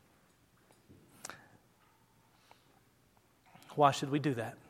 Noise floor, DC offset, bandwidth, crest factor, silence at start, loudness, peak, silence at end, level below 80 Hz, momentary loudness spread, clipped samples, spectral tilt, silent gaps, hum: -69 dBFS; under 0.1%; 16.5 kHz; 26 dB; 1.25 s; -32 LUFS; -12 dBFS; 0.15 s; -78 dBFS; 21 LU; under 0.1%; -5.5 dB/octave; none; none